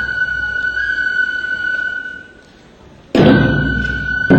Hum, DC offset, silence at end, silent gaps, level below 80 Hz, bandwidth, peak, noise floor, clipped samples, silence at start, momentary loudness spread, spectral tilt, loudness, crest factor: none; under 0.1%; 0 s; none; -32 dBFS; 8.4 kHz; 0 dBFS; -43 dBFS; under 0.1%; 0 s; 10 LU; -7 dB/octave; -16 LUFS; 16 dB